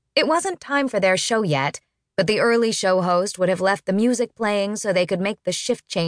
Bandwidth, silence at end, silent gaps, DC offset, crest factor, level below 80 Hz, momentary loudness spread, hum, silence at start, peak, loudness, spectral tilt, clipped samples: 10.5 kHz; 0 s; none; under 0.1%; 16 dB; -64 dBFS; 6 LU; none; 0.15 s; -4 dBFS; -21 LUFS; -4 dB/octave; under 0.1%